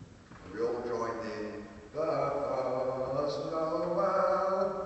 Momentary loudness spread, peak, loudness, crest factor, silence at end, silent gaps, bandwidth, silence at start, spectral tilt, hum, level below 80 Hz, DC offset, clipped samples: 14 LU; -16 dBFS; -32 LUFS; 16 dB; 0 s; none; 8.4 kHz; 0 s; -6.5 dB/octave; none; -62 dBFS; under 0.1%; under 0.1%